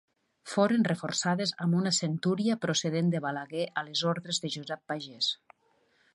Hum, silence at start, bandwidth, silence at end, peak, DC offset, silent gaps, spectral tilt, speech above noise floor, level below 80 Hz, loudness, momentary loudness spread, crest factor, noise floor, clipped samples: none; 0.45 s; 11.5 kHz; 0.8 s; -10 dBFS; under 0.1%; none; -4.5 dB/octave; 40 dB; -76 dBFS; -30 LUFS; 9 LU; 20 dB; -69 dBFS; under 0.1%